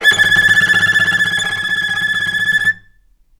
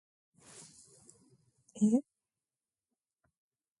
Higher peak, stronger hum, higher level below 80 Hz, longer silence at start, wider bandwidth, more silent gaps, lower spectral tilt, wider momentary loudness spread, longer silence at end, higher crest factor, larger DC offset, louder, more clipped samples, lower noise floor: first, 0 dBFS vs -18 dBFS; neither; first, -50 dBFS vs -84 dBFS; second, 0 s vs 1.75 s; first, 16.5 kHz vs 11.5 kHz; neither; second, -1 dB/octave vs -7 dB/octave; second, 7 LU vs 25 LU; second, 0.6 s vs 1.8 s; second, 14 dB vs 22 dB; neither; first, -12 LUFS vs -32 LUFS; neither; second, -51 dBFS vs under -90 dBFS